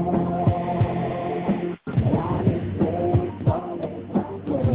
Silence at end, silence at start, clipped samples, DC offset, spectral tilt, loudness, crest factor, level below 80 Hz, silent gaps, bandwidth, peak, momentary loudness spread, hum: 0 s; 0 s; under 0.1%; under 0.1%; -13 dB/octave; -24 LUFS; 16 dB; -38 dBFS; none; 4 kHz; -8 dBFS; 5 LU; none